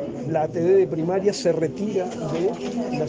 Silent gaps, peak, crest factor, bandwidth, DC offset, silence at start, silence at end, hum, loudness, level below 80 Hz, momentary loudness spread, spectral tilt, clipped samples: none; -8 dBFS; 14 dB; 9.6 kHz; under 0.1%; 0 s; 0 s; none; -23 LUFS; -58 dBFS; 7 LU; -6.5 dB/octave; under 0.1%